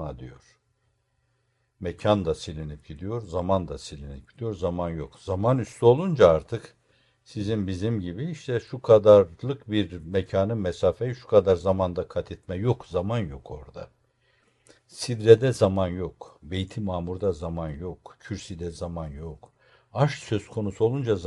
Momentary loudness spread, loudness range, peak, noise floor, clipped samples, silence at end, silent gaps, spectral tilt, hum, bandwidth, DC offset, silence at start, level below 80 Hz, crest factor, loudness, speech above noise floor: 19 LU; 9 LU; -2 dBFS; -71 dBFS; under 0.1%; 0 s; none; -7 dB/octave; none; 11.5 kHz; under 0.1%; 0 s; -52 dBFS; 24 dB; -25 LUFS; 47 dB